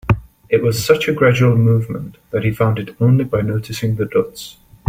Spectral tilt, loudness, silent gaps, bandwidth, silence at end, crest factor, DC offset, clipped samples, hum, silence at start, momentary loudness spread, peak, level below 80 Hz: -6.5 dB/octave; -17 LUFS; none; 16.5 kHz; 0.35 s; 14 dB; under 0.1%; under 0.1%; none; 0.05 s; 13 LU; -2 dBFS; -42 dBFS